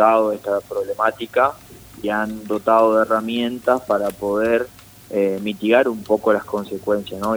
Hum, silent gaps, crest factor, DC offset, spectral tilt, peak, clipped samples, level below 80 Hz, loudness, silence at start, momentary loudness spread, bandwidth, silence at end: none; none; 18 dB; under 0.1%; -5.5 dB/octave; -2 dBFS; under 0.1%; -54 dBFS; -20 LUFS; 0 s; 9 LU; over 20 kHz; 0 s